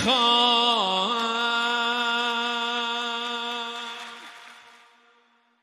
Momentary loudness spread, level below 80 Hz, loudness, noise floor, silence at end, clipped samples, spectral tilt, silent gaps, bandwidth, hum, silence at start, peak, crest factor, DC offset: 17 LU; -68 dBFS; -23 LUFS; -63 dBFS; 1.05 s; under 0.1%; -2 dB/octave; none; 15.5 kHz; none; 0 s; -8 dBFS; 18 dB; under 0.1%